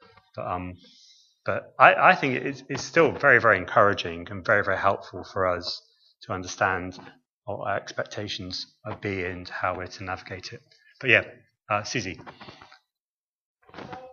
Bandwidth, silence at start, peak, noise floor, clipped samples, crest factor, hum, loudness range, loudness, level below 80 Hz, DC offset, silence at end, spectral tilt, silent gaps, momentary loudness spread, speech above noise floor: 7.4 kHz; 0.35 s; 0 dBFS; under -90 dBFS; under 0.1%; 26 dB; none; 11 LU; -24 LUFS; -62 dBFS; under 0.1%; 0.05 s; -4.5 dB/octave; 7.29-7.42 s, 13.00-13.55 s; 20 LU; over 65 dB